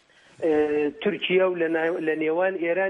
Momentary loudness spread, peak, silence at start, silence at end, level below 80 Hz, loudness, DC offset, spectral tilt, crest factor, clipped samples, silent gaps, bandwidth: 4 LU; -10 dBFS; 0.4 s; 0 s; -64 dBFS; -24 LUFS; under 0.1%; -7 dB/octave; 14 dB; under 0.1%; none; 7.2 kHz